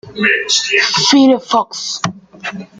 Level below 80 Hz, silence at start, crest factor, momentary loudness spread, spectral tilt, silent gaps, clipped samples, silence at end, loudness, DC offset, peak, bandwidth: -58 dBFS; 0.05 s; 14 dB; 16 LU; -2.5 dB/octave; none; under 0.1%; 0.15 s; -12 LUFS; under 0.1%; 0 dBFS; 9.4 kHz